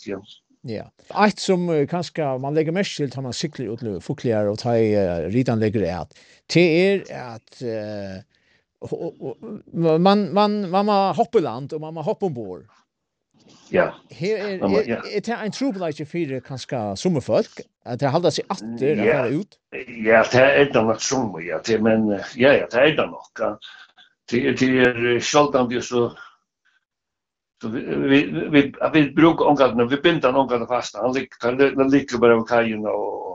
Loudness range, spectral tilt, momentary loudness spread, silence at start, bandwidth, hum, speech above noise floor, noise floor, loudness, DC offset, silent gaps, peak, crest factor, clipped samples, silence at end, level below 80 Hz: 6 LU; -5.5 dB/octave; 16 LU; 0.05 s; 9.2 kHz; none; 64 dB; -84 dBFS; -20 LUFS; under 0.1%; none; -2 dBFS; 20 dB; under 0.1%; 0 s; -56 dBFS